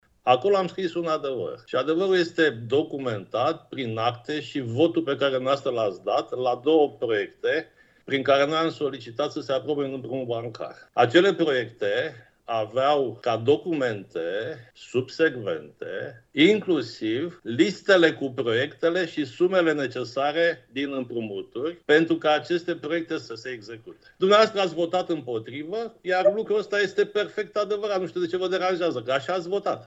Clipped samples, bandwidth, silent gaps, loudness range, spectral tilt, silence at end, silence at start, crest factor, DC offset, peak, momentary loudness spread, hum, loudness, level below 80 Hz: under 0.1%; 8 kHz; none; 3 LU; -5.5 dB/octave; 0.05 s; 0.25 s; 20 dB; under 0.1%; -4 dBFS; 12 LU; none; -25 LUFS; -72 dBFS